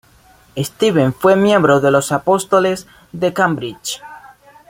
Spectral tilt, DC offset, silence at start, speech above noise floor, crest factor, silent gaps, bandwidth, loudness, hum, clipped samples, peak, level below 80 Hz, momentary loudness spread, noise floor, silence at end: -5 dB/octave; under 0.1%; 0.55 s; 34 dB; 14 dB; none; 16.5 kHz; -15 LUFS; none; under 0.1%; -2 dBFS; -54 dBFS; 14 LU; -49 dBFS; 0.45 s